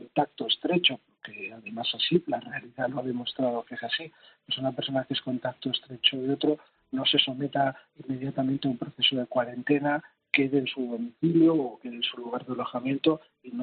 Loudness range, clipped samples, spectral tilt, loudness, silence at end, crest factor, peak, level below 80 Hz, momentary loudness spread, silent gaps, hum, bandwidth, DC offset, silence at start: 4 LU; under 0.1%; -3 dB/octave; -28 LUFS; 0 s; 24 dB; -6 dBFS; -74 dBFS; 12 LU; none; none; 4.7 kHz; under 0.1%; 0 s